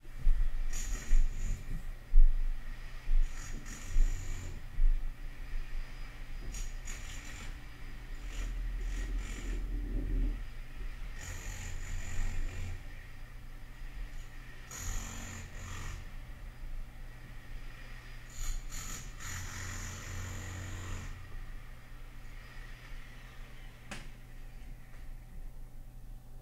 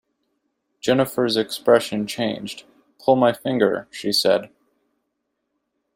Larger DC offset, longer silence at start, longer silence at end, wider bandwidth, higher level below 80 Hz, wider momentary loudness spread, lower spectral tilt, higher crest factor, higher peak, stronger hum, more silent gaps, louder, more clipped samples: neither; second, 0.05 s vs 0.85 s; second, 0 s vs 1.5 s; second, 13.5 kHz vs 16 kHz; first, -34 dBFS vs -64 dBFS; first, 15 LU vs 9 LU; about the same, -4 dB/octave vs -4.5 dB/octave; about the same, 24 dB vs 20 dB; second, -10 dBFS vs -2 dBFS; neither; neither; second, -42 LUFS vs -20 LUFS; neither